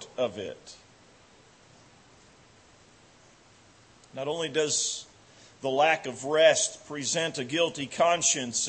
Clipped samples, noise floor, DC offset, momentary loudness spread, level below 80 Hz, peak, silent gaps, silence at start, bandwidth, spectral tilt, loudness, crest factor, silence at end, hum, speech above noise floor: under 0.1%; -57 dBFS; under 0.1%; 16 LU; -72 dBFS; -8 dBFS; none; 0 s; 8.8 kHz; -1.5 dB/octave; -26 LUFS; 22 dB; 0 s; none; 30 dB